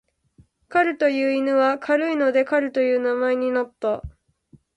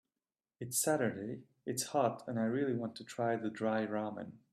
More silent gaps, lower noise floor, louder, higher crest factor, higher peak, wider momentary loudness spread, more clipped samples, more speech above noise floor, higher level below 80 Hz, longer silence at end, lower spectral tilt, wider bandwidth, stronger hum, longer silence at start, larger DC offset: neither; second, -57 dBFS vs under -90 dBFS; first, -21 LUFS vs -36 LUFS; about the same, 16 dB vs 18 dB; first, -6 dBFS vs -18 dBFS; second, 6 LU vs 11 LU; neither; second, 37 dB vs over 54 dB; first, -52 dBFS vs -80 dBFS; first, 0.65 s vs 0.15 s; first, -6 dB/octave vs -4.5 dB/octave; second, 8.8 kHz vs 14.5 kHz; neither; about the same, 0.7 s vs 0.6 s; neither